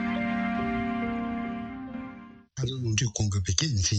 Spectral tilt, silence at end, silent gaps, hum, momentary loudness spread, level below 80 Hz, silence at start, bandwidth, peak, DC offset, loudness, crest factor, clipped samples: -4.5 dB/octave; 0 s; none; none; 13 LU; -48 dBFS; 0 s; 9.2 kHz; -8 dBFS; under 0.1%; -29 LUFS; 22 dB; under 0.1%